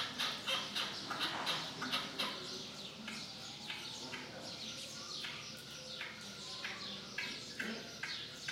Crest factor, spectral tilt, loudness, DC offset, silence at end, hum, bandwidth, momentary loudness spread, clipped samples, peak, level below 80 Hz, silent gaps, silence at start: 22 dB; -2 dB/octave; -41 LUFS; under 0.1%; 0 s; none; 16 kHz; 9 LU; under 0.1%; -22 dBFS; -74 dBFS; none; 0 s